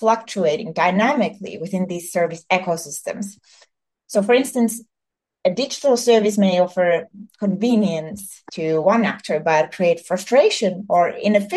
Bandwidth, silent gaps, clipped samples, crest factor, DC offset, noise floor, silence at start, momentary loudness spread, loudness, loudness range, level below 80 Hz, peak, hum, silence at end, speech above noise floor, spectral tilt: 12.5 kHz; none; under 0.1%; 16 dB; under 0.1%; -84 dBFS; 0 s; 11 LU; -19 LUFS; 4 LU; -70 dBFS; -2 dBFS; none; 0 s; 65 dB; -5 dB/octave